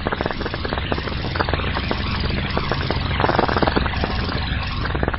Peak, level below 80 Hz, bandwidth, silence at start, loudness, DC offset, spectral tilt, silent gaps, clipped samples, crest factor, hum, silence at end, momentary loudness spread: -4 dBFS; -28 dBFS; 5.8 kHz; 0 s; -22 LUFS; under 0.1%; -10 dB/octave; none; under 0.1%; 18 dB; none; 0 s; 6 LU